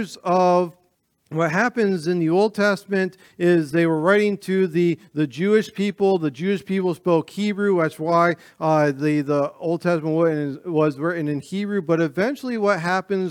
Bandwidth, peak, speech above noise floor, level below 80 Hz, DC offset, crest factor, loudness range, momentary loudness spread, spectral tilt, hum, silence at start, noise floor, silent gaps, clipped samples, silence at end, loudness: 15 kHz; -4 dBFS; 45 dB; -70 dBFS; under 0.1%; 16 dB; 2 LU; 6 LU; -7 dB/octave; none; 0 s; -66 dBFS; none; under 0.1%; 0 s; -21 LUFS